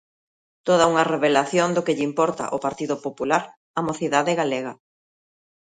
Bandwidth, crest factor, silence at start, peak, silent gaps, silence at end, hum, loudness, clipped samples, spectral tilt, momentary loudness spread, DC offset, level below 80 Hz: 9.6 kHz; 20 dB; 0.65 s; -2 dBFS; 3.57-3.74 s; 1.05 s; none; -22 LUFS; under 0.1%; -4.5 dB/octave; 9 LU; under 0.1%; -64 dBFS